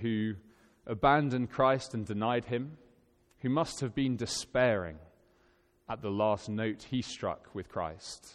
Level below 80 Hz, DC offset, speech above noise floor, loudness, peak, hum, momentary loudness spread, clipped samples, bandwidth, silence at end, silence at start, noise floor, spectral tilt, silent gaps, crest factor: -58 dBFS; under 0.1%; 36 dB; -32 LUFS; -12 dBFS; none; 14 LU; under 0.1%; 13 kHz; 0 s; 0 s; -68 dBFS; -5.5 dB/octave; none; 20 dB